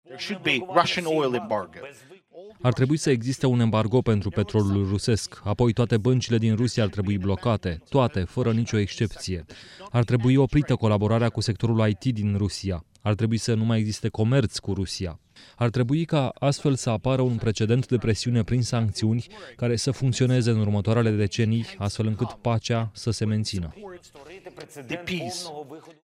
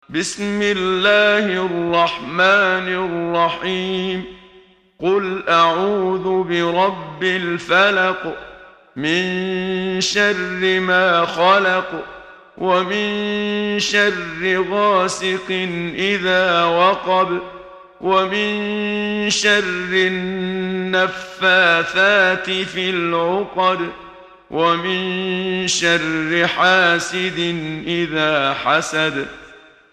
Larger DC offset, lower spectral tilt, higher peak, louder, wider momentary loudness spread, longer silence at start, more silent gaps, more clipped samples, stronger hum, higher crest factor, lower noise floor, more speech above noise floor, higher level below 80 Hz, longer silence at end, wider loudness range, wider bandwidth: neither; first, -6 dB/octave vs -3.5 dB/octave; second, -4 dBFS vs 0 dBFS; second, -24 LUFS vs -17 LUFS; about the same, 11 LU vs 9 LU; about the same, 0.1 s vs 0.1 s; neither; neither; neither; about the same, 20 dB vs 18 dB; about the same, -46 dBFS vs -49 dBFS; second, 22 dB vs 31 dB; first, -48 dBFS vs -54 dBFS; second, 0.15 s vs 0.35 s; about the same, 3 LU vs 3 LU; about the same, 11.5 kHz vs 12 kHz